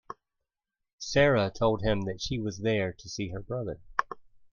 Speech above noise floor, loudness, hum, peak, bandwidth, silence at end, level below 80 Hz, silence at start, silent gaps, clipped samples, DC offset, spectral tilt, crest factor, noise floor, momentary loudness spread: 58 dB; -29 LUFS; none; -6 dBFS; 7.4 kHz; 0.3 s; -50 dBFS; 0.1 s; 0.93-0.98 s; under 0.1%; under 0.1%; -5.5 dB/octave; 24 dB; -87 dBFS; 19 LU